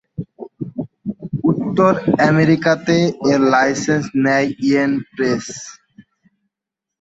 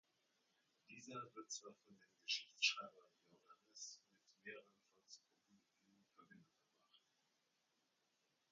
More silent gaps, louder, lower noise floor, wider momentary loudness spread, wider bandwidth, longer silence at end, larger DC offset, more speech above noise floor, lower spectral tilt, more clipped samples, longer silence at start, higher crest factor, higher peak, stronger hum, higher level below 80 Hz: neither; first, -16 LUFS vs -46 LUFS; about the same, -84 dBFS vs -86 dBFS; second, 17 LU vs 24 LU; second, 8 kHz vs 9 kHz; second, 1 s vs 1.55 s; neither; first, 69 dB vs 36 dB; first, -6 dB/octave vs 0 dB/octave; neither; second, 0.2 s vs 0.9 s; second, 16 dB vs 30 dB; first, -2 dBFS vs -24 dBFS; neither; first, -54 dBFS vs under -90 dBFS